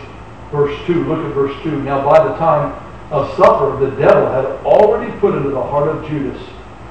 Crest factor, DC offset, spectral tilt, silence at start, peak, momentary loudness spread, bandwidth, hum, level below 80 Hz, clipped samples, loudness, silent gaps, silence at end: 14 dB; 0.9%; -8 dB/octave; 0 s; 0 dBFS; 13 LU; 8.6 kHz; none; -40 dBFS; under 0.1%; -15 LUFS; none; 0 s